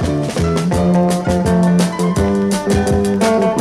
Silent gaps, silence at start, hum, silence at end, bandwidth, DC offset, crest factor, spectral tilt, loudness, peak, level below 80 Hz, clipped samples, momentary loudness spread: none; 0 s; none; 0 s; 13.5 kHz; under 0.1%; 12 dB; -6.5 dB/octave; -15 LUFS; -2 dBFS; -32 dBFS; under 0.1%; 3 LU